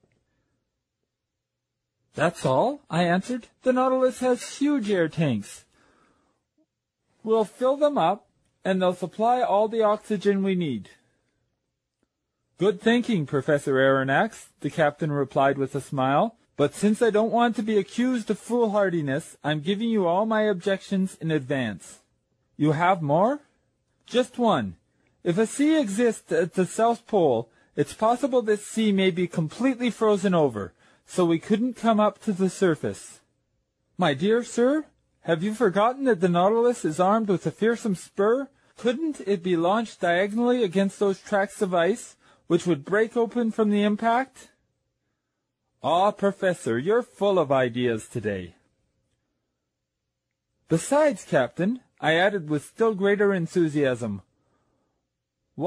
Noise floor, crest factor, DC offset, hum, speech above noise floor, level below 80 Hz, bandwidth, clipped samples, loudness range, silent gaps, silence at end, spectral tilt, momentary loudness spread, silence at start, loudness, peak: -83 dBFS; 16 dB; under 0.1%; none; 60 dB; -68 dBFS; 13 kHz; under 0.1%; 4 LU; none; 0 s; -6 dB/octave; 8 LU; 2.15 s; -24 LUFS; -8 dBFS